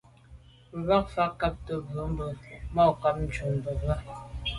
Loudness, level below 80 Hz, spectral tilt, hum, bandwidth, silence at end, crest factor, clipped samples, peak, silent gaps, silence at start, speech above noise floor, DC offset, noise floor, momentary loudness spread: -29 LUFS; -40 dBFS; -7 dB/octave; none; 11.5 kHz; 0 s; 20 dB; under 0.1%; -10 dBFS; none; 0.3 s; 24 dB; under 0.1%; -52 dBFS; 12 LU